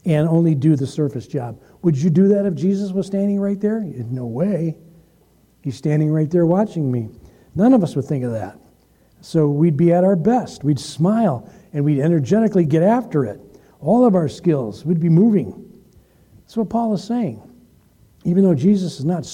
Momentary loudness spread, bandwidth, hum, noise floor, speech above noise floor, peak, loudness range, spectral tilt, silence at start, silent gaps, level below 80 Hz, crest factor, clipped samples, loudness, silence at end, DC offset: 13 LU; 10.5 kHz; none; -55 dBFS; 38 dB; -4 dBFS; 4 LU; -8.5 dB/octave; 0.05 s; none; -56 dBFS; 14 dB; under 0.1%; -18 LUFS; 0 s; under 0.1%